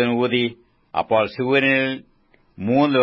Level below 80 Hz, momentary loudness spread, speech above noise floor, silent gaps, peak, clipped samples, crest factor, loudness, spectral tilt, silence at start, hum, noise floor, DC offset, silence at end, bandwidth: -60 dBFS; 11 LU; 32 dB; none; -6 dBFS; under 0.1%; 16 dB; -20 LUFS; -8 dB/octave; 0 s; none; -51 dBFS; under 0.1%; 0 s; 5.8 kHz